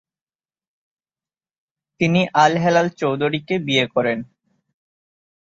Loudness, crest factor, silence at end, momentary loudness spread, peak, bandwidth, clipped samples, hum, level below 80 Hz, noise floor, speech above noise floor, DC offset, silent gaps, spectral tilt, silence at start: -19 LUFS; 20 dB; 1.25 s; 8 LU; -2 dBFS; 7.8 kHz; under 0.1%; none; -62 dBFS; under -90 dBFS; over 72 dB; under 0.1%; none; -5.5 dB/octave; 2 s